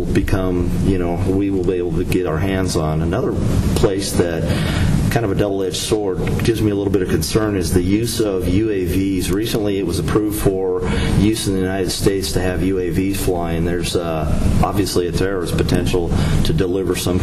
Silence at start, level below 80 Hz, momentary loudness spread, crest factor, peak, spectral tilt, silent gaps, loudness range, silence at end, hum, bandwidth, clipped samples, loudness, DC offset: 0 s; -26 dBFS; 2 LU; 12 dB; -4 dBFS; -6 dB/octave; none; 1 LU; 0 s; none; 14.5 kHz; under 0.1%; -18 LUFS; under 0.1%